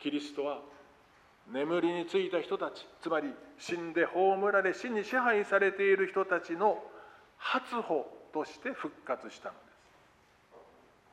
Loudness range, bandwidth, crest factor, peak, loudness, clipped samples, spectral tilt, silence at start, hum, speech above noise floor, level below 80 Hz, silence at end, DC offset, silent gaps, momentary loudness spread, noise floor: 8 LU; 10 kHz; 18 dB; -14 dBFS; -32 LUFS; under 0.1%; -5 dB/octave; 0 s; none; 32 dB; -78 dBFS; 0.5 s; under 0.1%; none; 14 LU; -64 dBFS